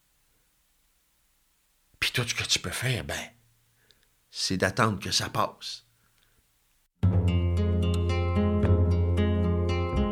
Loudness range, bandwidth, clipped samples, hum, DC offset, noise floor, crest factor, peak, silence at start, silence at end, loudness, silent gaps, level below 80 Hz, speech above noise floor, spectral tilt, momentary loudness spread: 5 LU; 15.5 kHz; under 0.1%; none; under 0.1%; -69 dBFS; 20 dB; -8 dBFS; 2 s; 0 s; -27 LUFS; none; -44 dBFS; 41 dB; -5 dB/octave; 9 LU